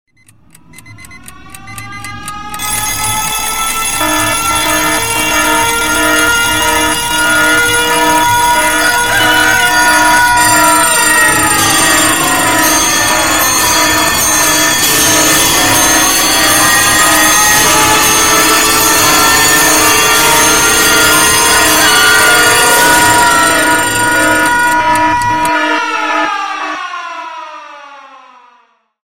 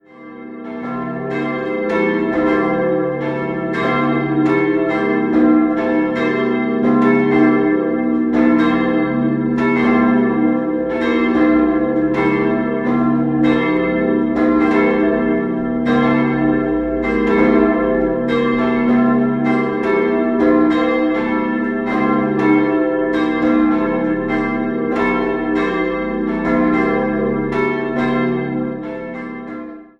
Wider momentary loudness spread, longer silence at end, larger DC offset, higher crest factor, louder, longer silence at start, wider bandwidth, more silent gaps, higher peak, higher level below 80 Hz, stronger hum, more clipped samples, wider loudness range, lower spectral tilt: about the same, 7 LU vs 7 LU; first, 0.4 s vs 0.15 s; first, 2% vs under 0.1%; about the same, 10 dB vs 14 dB; first, -7 LUFS vs -16 LUFS; first, 0.75 s vs 0.15 s; first, 17.5 kHz vs 6 kHz; neither; about the same, 0 dBFS vs -2 dBFS; first, -34 dBFS vs -42 dBFS; neither; neither; first, 8 LU vs 3 LU; second, -1 dB/octave vs -8.5 dB/octave